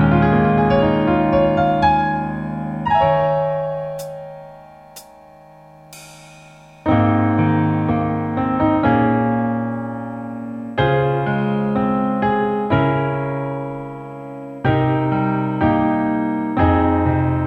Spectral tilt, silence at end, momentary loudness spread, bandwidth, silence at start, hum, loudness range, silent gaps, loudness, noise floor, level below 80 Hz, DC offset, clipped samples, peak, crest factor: -8.5 dB/octave; 0 s; 13 LU; 14 kHz; 0 s; none; 6 LU; none; -18 LUFS; -44 dBFS; -38 dBFS; under 0.1%; under 0.1%; -4 dBFS; 16 dB